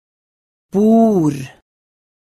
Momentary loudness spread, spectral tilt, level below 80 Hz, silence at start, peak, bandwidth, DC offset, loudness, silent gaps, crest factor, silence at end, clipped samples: 18 LU; -8.5 dB/octave; -56 dBFS; 0.75 s; -4 dBFS; 12.5 kHz; under 0.1%; -14 LUFS; none; 14 dB; 0.9 s; under 0.1%